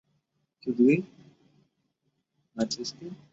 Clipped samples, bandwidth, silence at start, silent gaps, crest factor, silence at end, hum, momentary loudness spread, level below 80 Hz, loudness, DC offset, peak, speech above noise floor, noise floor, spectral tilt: under 0.1%; 8 kHz; 0.65 s; none; 20 dB; 0.2 s; none; 22 LU; -70 dBFS; -28 LUFS; under 0.1%; -10 dBFS; 51 dB; -77 dBFS; -5.5 dB/octave